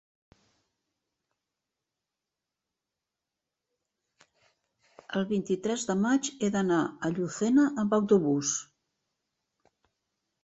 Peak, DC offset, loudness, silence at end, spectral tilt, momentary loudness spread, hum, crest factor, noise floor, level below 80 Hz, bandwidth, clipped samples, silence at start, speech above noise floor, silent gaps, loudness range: -12 dBFS; under 0.1%; -28 LUFS; 1.8 s; -5 dB/octave; 7 LU; none; 20 dB; -88 dBFS; -70 dBFS; 8.2 kHz; under 0.1%; 5.1 s; 61 dB; none; 10 LU